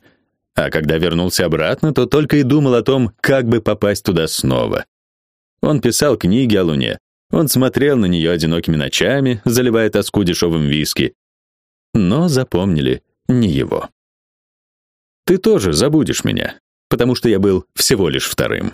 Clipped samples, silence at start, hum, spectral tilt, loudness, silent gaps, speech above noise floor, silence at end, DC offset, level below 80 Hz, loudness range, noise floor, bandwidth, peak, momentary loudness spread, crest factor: under 0.1%; 0.55 s; none; -5 dB/octave; -16 LUFS; 4.88-5.57 s, 7.00-7.30 s, 11.15-11.93 s, 13.92-15.23 s, 16.60-16.90 s; 43 dB; 0 s; under 0.1%; -40 dBFS; 3 LU; -57 dBFS; 15.5 kHz; 0 dBFS; 7 LU; 16 dB